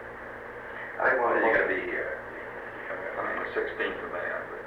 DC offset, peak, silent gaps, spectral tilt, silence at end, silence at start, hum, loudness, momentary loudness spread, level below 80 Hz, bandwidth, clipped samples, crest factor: under 0.1%; -12 dBFS; none; -6 dB/octave; 0 s; 0 s; none; -29 LUFS; 15 LU; -58 dBFS; 11.5 kHz; under 0.1%; 18 dB